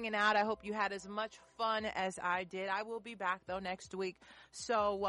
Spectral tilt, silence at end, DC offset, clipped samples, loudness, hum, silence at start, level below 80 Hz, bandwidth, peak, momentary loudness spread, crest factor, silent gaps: -3.5 dB/octave; 0 s; under 0.1%; under 0.1%; -37 LUFS; none; 0 s; -70 dBFS; 11.5 kHz; -20 dBFS; 11 LU; 18 dB; none